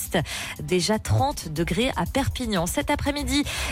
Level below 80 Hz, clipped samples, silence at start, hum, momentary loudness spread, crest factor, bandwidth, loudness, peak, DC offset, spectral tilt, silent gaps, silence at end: -36 dBFS; under 0.1%; 0 s; none; 3 LU; 14 dB; 16.5 kHz; -25 LUFS; -12 dBFS; under 0.1%; -4.5 dB/octave; none; 0 s